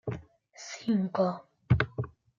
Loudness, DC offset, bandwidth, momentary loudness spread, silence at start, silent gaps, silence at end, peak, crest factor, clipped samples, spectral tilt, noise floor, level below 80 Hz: -30 LUFS; under 0.1%; 7.6 kHz; 16 LU; 0.05 s; none; 0.3 s; -10 dBFS; 22 dB; under 0.1%; -7 dB/octave; -51 dBFS; -52 dBFS